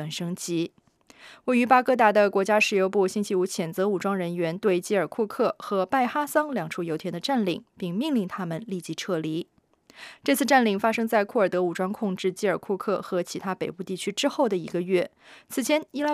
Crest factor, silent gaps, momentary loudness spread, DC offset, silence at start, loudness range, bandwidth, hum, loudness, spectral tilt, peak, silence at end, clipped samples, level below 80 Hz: 20 dB; none; 12 LU; under 0.1%; 0 s; 6 LU; 15.5 kHz; none; -25 LUFS; -5 dB/octave; -4 dBFS; 0 s; under 0.1%; -74 dBFS